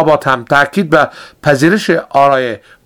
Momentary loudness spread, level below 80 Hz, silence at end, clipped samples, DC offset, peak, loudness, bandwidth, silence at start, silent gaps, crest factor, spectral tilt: 7 LU; -48 dBFS; 0.3 s; 0.5%; under 0.1%; 0 dBFS; -12 LUFS; 20 kHz; 0 s; none; 12 dB; -5.5 dB/octave